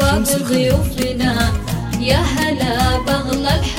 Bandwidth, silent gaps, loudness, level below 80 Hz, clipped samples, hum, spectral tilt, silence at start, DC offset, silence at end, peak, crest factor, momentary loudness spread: 17 kHz; none; -17 LUFS; -24 dBFS; under 0.1%; none; -5 dB/octave; 0 s; under 0.1%; 0 s; 0 dBFS; 16 dB; 4 LU